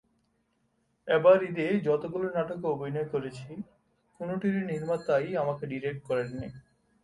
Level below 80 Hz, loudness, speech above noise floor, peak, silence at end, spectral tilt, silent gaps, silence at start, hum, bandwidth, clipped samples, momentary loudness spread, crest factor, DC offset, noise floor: -64 dBFS; -29 LUFS; 45 dB; -10 dBFS; 0.45 s; -8 dB/octave; none; 1.05 s; none; 11.5 kHz; under 0.1%; 18 LU; 20 dB; under 0.1%; -74 dBFS